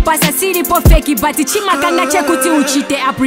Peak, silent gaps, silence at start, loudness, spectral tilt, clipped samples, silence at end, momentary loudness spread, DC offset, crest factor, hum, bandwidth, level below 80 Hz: 0 dBFS; none; 0 s; -12 LUFS; -4 dB/octave; under 0.1%; 0 s; 3 LU; under 0.1%; 12 dB; none; 16.5 kHz; -18 dBFS